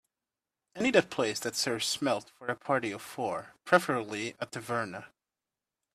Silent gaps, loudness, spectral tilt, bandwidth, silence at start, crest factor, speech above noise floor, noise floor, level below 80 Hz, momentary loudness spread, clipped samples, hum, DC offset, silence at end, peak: none; -31 LUFS; -3.5 dB/octave; 15.5 kHz; 0.75 s; 26 dB; over 59 dB; under -90 dBFS; -74 dBFS; 11 LU; under 0.1%; none; under 0.1%; 0.85 s; -8 dBFS